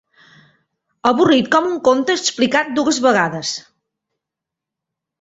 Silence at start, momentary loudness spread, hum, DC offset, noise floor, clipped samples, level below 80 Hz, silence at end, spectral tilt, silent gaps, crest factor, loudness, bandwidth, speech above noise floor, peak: 1.05 s; 8 LU; none; under 0.1%; -84 dBFS; under 0.1%; -60 dBFS; 1.6 s; -3.5 dB/octave; none; 18 dB; -16 LUFS; 8 kHz; 68 dB; -2 dBFS